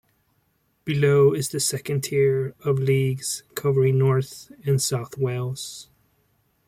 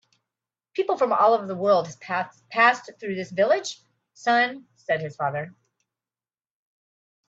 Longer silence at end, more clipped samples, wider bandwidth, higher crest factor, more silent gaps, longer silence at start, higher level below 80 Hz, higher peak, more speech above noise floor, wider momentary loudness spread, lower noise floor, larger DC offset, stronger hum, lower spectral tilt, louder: second, 0.85 s vs 1.8 s; neither; first, 16 kHz vs 8 kHz; second, 16 dB vs 22 dB; neither; about the same, 0.85 s vs 0.75 s; first, -60 dBFS vs -74 dBFS; second, -8 dBFS vs -4 dBFS; second, 46 dB vs over 67 dB; about the same, 13 LU vs 14 LU; second, -68 dBFS vs under -90 dBFS; neither; neither; about the same, -5.5 dB/octave vs -4.5 dB/octave; about the same, -23 LUFS vs -24 LUFS